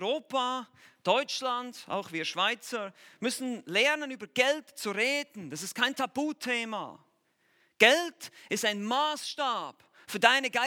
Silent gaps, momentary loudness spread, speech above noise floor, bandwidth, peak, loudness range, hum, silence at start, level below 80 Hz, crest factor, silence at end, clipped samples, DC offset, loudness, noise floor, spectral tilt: none; 14 LU; 41 dB; 18.5 kHz; -4 dBFS; 3 LU; none; 0 s; -88 dBFS; 26 dB; 0 s; under 0.1%; under 0.1%; -29 LUFS; -71 dBFS; -2 dB/octave